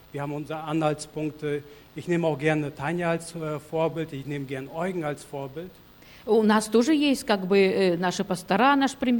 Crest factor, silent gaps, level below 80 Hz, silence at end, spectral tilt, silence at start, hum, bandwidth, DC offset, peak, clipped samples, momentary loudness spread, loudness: 16 dB; none; -60 dBFS; 0 s; -5.5 dB/octave; 0.15 s; none; 17.5 kHz; under 0.1%; -10 dBFS; under 0.1%; 14 LU; -25 LUFS